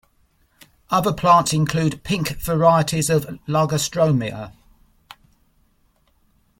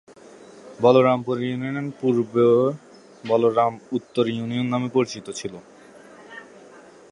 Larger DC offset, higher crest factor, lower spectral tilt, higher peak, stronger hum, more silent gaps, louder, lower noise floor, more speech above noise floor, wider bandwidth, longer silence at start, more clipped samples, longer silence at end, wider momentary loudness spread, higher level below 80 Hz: neither; about the same, 18 dB vs 20 dB; second, -5 dB/octave vs -6.5 dB/octave; about the same, -2 dBFS vs -4 dBFS; neither; neither; first, -19 LUFS vs -22 LUFS; first, -62 dBFS vs -47 dBFS; first, 43 dB vs 26 dB; first, 16.5 kHz vs 10.5 kHz; first, 0.9 s vs 0.55 s; neither; first, 2.1 s vs 0.3 s; second, 8 LU vs 21 LU; first, -46 dBFS vs -66 dBFS